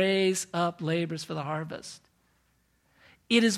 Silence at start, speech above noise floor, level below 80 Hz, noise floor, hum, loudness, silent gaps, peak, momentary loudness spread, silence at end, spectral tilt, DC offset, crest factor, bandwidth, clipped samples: 0 s; 42 dB; -72 dBFS; -70 dBFS; none; -29 LUFS; none; -10 dBFS; 16 LU; 0 s; -4.5 dB/octave; under 0.1%; 20 dB; 14.5 kHz; under 0.1%